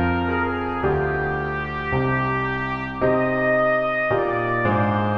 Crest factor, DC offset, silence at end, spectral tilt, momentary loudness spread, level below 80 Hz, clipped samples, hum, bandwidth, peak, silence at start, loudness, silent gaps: 12 dB; under 0.1%; 0 s; -9 dB/octave; 5 LU; -40 dBFS; under 0.1%; none; 6.6 kHz; -8 dBFS; 0 s; -22 LUFS; none